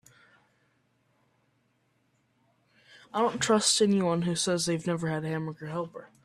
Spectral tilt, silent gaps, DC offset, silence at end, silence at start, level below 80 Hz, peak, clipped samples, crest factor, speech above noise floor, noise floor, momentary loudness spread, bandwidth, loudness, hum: -4 dB/octave; none; under 0.1%; 0.2 s; 3.15 s; -70 dBFS; -10 dBFS; under 0.1%; 20 dB; 44 dB; -72 dBFS; 13 LU; 14 kHz; -27 LUFS; none